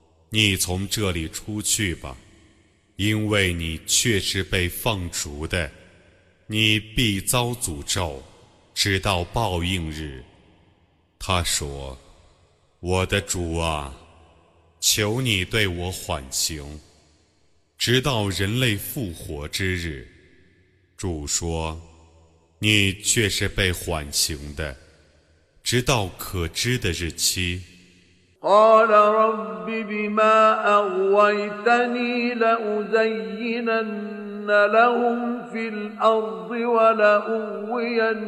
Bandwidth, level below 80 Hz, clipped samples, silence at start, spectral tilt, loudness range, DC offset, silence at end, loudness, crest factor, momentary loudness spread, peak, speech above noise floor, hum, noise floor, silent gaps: 15 kHz; -42 dBFS; under 0.1%; 0.3 s; -3.5 dB/octave; 7 LU; under 0.1%; 0 s; -22 LUFS; 20 dB; 13 LU; -4 dBFS; 41 dB; none; -63 dBFS; none